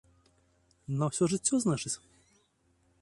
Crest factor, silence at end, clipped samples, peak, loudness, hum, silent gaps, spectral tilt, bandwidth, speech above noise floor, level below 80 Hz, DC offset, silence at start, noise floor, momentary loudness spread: 20 dB; 1.05 s; under 0.1%; -14 dBFS; -31 LUFS; none; none; -5 dB/octave; 11.5 kHz; 41 dB; -66 dBFS; under 0.1%; 0.9 s; -71 dBFS; 11 LU